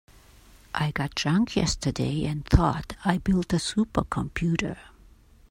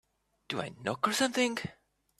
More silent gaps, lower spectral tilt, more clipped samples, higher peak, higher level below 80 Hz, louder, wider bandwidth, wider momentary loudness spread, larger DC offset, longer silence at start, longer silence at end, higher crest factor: neither; first, -5.5 dB/octave vs -3 dB/octave; neither; first, -2 dBFS vs -14 dBFS; first, -36 dBFS vs -72 dBFS; first, -26 LUFS vs -32 LUFS; first, 16 kHz vs 14.5 kHz; second, 7 LU vs 11 LU; neither; first, 0.75 s vs 0.5 s; first, 0.65 s vs 0.45 s; about the same, 24 dB vs 20 dB